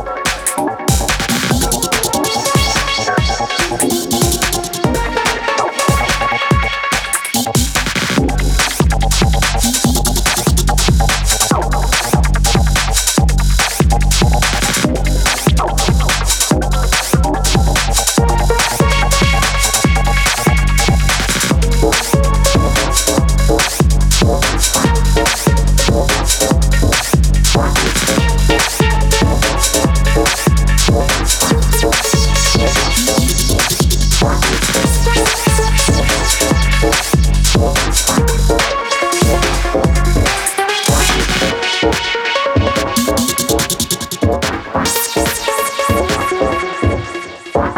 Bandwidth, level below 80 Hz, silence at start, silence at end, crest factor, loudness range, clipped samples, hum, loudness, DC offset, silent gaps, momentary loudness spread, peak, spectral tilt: 20 kHz; -16 dBFS; 0 s; 0 s; 12 dB; 2 LU; under 0.1%; none; -13 LUFS; under 0.1%; none; 3 LU; 0 dBFS; -3.5 dB/octave